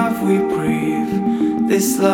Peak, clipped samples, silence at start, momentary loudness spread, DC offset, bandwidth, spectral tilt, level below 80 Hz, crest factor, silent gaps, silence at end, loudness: -2 dBFS; under 0.1%; 0 s; 3 LU; under 0.1%; 19 kHz; -5.5 dB/octave; -50 dBFS; 16 dB; none; 0 s; -18 LUFS